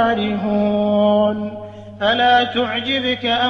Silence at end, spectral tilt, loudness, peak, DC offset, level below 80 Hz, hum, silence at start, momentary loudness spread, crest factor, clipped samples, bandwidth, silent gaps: 0 s; -6.5 dB/octave; -17 LUFS; -4 dBFS; under 0.1%; -54 dBFS; none; 0 s; 12 LU; 14 dB; under 0.1%; 6.6 kHz; none